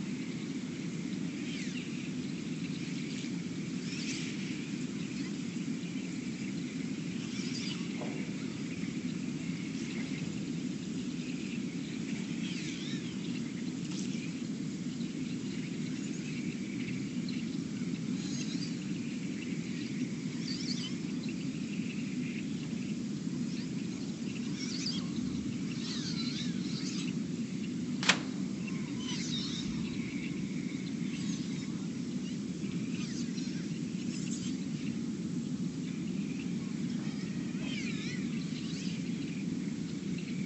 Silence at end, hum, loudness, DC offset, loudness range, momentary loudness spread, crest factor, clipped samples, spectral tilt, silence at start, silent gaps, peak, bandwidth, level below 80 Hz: 0 s; none; -37 LUFS; under 0.1%; 3 LU; 3 LU; 28 dB; under 0.1%; -5 dB/octave; 0 s; none; -10 dBFS; 8.4 kHz; -66 dBFS